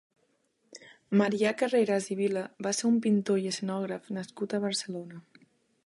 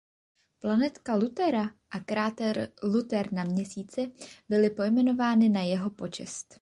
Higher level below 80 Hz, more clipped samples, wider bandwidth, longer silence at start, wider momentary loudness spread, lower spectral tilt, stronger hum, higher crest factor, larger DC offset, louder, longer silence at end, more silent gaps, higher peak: second, -80 dBFS vs -68 dBFS; neither; about the same, 11.5 kHz vs 11 kHz; about the same, 0.75 s vs 0.65 s; about the same, 13 LU vs 12 LU; about the same, -5 dB/octave vs -6 dB/octave; neither; about the same, 18 dB vs 16 dB; neither; about the same, -29 LUFS vs -28 LUFS; first, 0.65 s vs 0.2 s; neither; about the same, -12 dBFS vs -12 dBFS